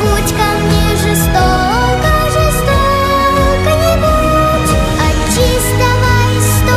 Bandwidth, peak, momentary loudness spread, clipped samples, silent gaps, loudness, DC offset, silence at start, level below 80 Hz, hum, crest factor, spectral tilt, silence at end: 16 kHz; 0 dBFS; 2 LU; under 0.1%; none; -11 LUFS; under 0.1%; 0 s; -18 dBFS; none; 10 dB; -5 dB/octave; 0 s